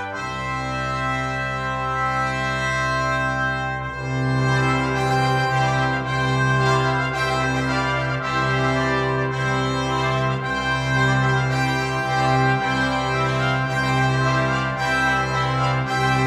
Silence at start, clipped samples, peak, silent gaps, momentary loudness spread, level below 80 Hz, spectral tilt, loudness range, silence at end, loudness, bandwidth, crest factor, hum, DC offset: 0 s; under 0.1%; -6 dBFS; none; 5 LU; -40 dBFS; -5.5 dB/octave; 2 LU; 0 s; -21 LUFS; 11.5 kHz; 14 dB; none; under 0.1%